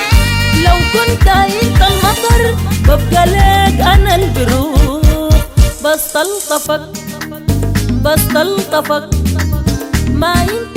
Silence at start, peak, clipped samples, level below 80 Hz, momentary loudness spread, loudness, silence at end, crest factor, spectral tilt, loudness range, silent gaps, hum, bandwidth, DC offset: 0 s; 0 dBFS; under 0.1%; -16 dBFS; 6 LU; -12 LUFS; 0 s; 10 dB; -5 dB/octave; 4 LU; none; none; 16.5 kHz; under 0.1%